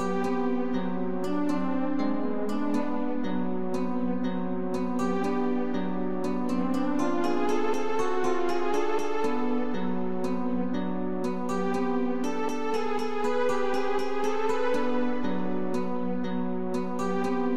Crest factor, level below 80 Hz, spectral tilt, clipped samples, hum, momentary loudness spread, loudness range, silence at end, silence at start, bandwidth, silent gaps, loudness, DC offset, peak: 12 dB; -60 dBFS; -6.5 dB/octave; under 0.1%; none; 3 LU; 2 LU; 0 s; 0 s; 13 kHz; none; -29 LUFS; 3%; -14 dBFS